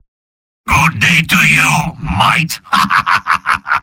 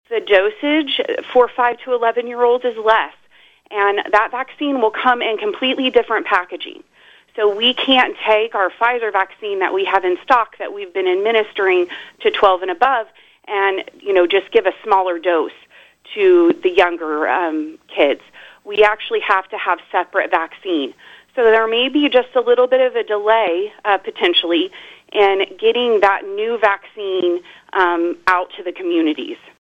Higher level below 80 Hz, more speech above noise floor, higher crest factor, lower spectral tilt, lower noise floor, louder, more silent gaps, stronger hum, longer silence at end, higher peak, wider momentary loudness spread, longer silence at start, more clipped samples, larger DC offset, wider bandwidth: first, -34 dBFS vs -58 dBFS; first, over 78 dB vs 35 dB; about the same, 14 dB vs 16 dB; about the same, -3 dB/octave vs -4 dB/octave; first, under -90 dBFS vs -51 dBFS; first, -11 LUFS vs -17 LUFS; neither; neither; second, 0 s vs 0.3 s; about the same, 0 dBFS vs 0 dBFS; second, 6 LU vs 10 LU; first, 0.65 s vs 0.1 s; neither; neither; first, 17 kHz vs 7.6 kHz